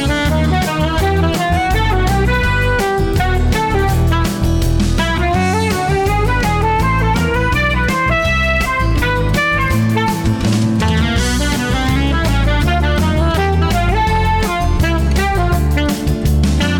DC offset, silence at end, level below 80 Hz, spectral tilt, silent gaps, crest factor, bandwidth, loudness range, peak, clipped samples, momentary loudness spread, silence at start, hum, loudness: under 0.1%; 0 s; -20 dBFS; -5.5 dB/octave; none; 8 dB; 18.5 kHz; 1 LU; -6 dBFS; under 0.1%; 1 LU; 0 s; none; -15 LUFS